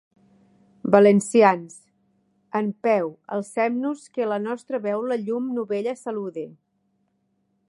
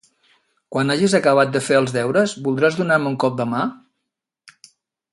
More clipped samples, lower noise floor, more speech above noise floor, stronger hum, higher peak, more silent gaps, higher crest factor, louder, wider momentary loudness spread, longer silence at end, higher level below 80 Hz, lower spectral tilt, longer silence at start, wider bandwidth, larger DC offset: neither; second, -70 dBFS vs -80 dBFS; second, 48 dB vs 62 dB; neither; about the same, -2 dBFS vs -2 dBFS; neither; about the same, 22 dB vs 18 dB; second, -23 LUFS vs -19 LUFS; first, 14 LU vs 7 LU; second, 1.2 s vs 1.35 s; second, -74 dBFS vs -64 dBFS; about the same, -6 dB/octave vs -5.5 dB/octave; first, 0.85 s vs 0.7 s; about the same, 11.5 kHz vs 11.5 kHz; neither